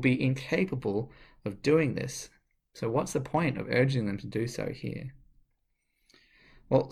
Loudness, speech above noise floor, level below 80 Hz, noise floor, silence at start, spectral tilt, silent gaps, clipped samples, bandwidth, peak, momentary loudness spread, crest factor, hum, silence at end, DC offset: -30 LUFS; 47 dB; -58 dBFS; -76 dBFS; 0 s; -6.5 dB/octave; none; under 0.1%; 14.5 kHz; -12 dBFS; 14 LU; 20 dB; none; 0 s; under 0.1%